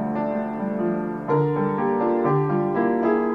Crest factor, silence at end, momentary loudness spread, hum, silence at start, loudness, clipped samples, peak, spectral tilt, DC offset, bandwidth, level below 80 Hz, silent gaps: 12 dB; 0 s; 5 LU; none; 0 s; -23 LUFS; under 0.1%; -10 dBFS; -10.5 dB/octave; 0.1%; 5.2 kHz; -60 dBFS; none